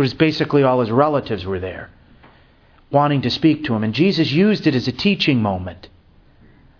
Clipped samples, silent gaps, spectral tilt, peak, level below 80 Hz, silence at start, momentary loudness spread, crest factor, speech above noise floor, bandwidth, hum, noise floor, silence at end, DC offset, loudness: under 0.1%; none; -7.5 dB/octave; 0 dBFS; -50 dBFS; 0 s; 10 LU; 18 dB; 34 dB; 5.4 kHz; none; -51 dBFS; 0.95 s; under 0.1%; -18 LUFS